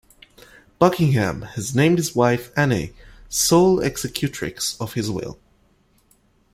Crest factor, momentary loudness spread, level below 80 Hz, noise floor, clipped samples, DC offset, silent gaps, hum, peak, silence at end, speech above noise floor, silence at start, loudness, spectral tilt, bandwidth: 20 dB; 11 LU; -48 dBFS; -60 dBFS; under 0.1%; under 0.1%; none; none; -2 dBFS; 1.2 s; 40 dB; 0.8 s; -20 LUFS; -5 dB/octave; 16 kHz